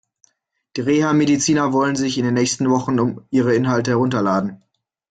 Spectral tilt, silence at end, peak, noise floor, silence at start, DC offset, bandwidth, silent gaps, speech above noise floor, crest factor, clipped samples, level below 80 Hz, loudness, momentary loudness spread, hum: -5 dB/octave; 0.55 s; -4 dBFS; -70 dBFS; 0.75 s; under 0.1%; 9.4 kHz; none; 52 dB; 14 dB; under 0.1%; -56 dBFS; -18 LUFS; 5 LU; none